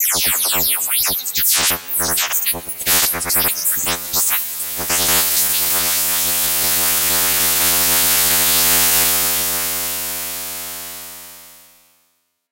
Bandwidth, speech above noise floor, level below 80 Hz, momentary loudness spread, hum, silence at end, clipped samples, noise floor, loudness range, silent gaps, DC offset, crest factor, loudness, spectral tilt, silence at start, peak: 16.5 kHz; 47 dB; -50 dBFS; 10 LU; none; 0.95 s; under 0.1%; -65 dBFS; 4 LU; none; 0.3%; 16 dB; -14 LUFS; 0 dB/octave; 0 s; -2 dBFS